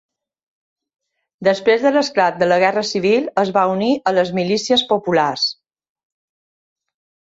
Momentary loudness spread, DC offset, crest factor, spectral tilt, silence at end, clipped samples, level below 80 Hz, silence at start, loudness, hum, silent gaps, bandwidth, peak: 4 LU; under 0.1%; 16 dB; -4.5 dB/octave; 1.75 s; under 0.1%; -62 dBFS; 1.4 s; -17 LUFS; none; none; 8 kHz; -2 dBFS